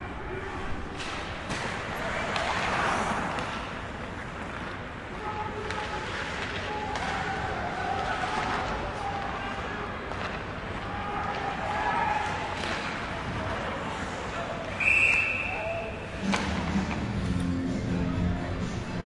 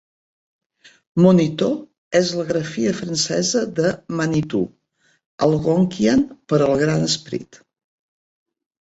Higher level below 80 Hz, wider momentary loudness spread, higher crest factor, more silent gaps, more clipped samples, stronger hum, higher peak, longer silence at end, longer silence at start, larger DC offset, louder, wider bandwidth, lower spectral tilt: first, -44 dBFS vs -54 dBFS; about the same, 9 LU vs 7 LU; about the same, 20 dB vs 18 dB; second, none vs 1.98-2.11 s, 5.26-5.38 s; neither; neither; second, -10 dBFS vs -2 dBFS; second, 0.05 s vs 1.4 s; second, 0 s vs 1.15 s; neither; second, -30 LUFS vs -19 LUFS; first, 12 kHz vs 8.2 kHz; about the same, -5 dB/octave vs -5.5 dB/octave